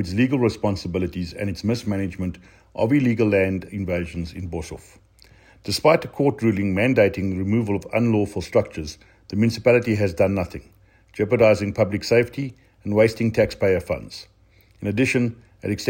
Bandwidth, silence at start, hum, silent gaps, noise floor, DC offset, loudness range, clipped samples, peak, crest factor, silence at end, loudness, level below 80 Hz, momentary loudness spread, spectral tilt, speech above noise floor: 16.5 kHz; 0 s; none; none; -55 dBFS; under 0.1%; 3 LU; under 0.1%; -4 dBFS; 18 dB; 0 s; -22 LUFS; -48 dBFS; 14 LU; -6.5 dB/octave; 34 dB